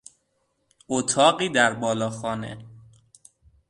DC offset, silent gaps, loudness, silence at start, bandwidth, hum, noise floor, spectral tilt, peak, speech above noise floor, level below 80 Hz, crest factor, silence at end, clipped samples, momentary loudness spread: under 0.1%; none; -23 LUFS; 0.9 s; 11.5 kHz; none; -72 dBFS; -3 dB/octave; -2 dBFS; 49 dB; -62 dBFS; 22 dB; 0.9 s; under 0.1%; 14 LU